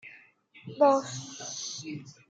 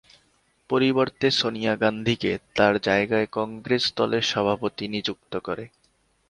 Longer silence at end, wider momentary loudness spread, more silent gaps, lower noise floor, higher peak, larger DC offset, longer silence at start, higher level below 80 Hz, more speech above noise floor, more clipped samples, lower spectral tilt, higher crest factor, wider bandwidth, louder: second, 0.15 s vs 0.6 s; first, 24 LU vs 10 LU; neither; second, -57 dBFS vs -66 dBFS; second, -10 dBFS vs -4 dBFS; neither; second, 0.05 s vs 0.7 s; second, -80 dBFS vs -58 dBFS; second, 28 dB vs 42 dB; neither; about the same, -4 dB/octave vs -5 dB/octave; about the same, 22 dB vs 22 dB; second, 9 kHz vs 11 kHz; second, -29 LUFS vs -24 LUFS